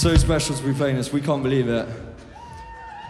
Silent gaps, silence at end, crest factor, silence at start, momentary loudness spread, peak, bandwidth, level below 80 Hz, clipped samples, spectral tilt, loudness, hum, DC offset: none; 0 s; 18 dB; 0 s; 20 LU; -4 dBFS; 14 kHz; -30 dBFS; under 0.1%; -5.5 dB/octave; -22 LUFS; none; under 0.1%